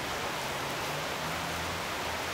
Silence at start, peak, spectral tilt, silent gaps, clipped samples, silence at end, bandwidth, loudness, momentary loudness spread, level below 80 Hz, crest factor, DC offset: 0 s; -22 dBFS; -3 dB/octave; none; under 0.1%; 0 s; 16 kHz; -33 LUFS; 0 LU; -56 dBFS; 12 dB; under 0.1%